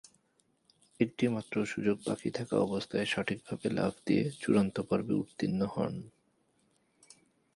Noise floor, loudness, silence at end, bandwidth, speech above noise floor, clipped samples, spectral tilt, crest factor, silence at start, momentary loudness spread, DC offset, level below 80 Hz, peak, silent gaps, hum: -73 dBFS; -33 LUFS; 1.45 s; 11.5 kHz; 41 dB; under 0.1%; -6.5 dB/octave; 20 dB; 1 s; 6 LU; under 0.1%; -66 dBFS; -14 dBFS; none; none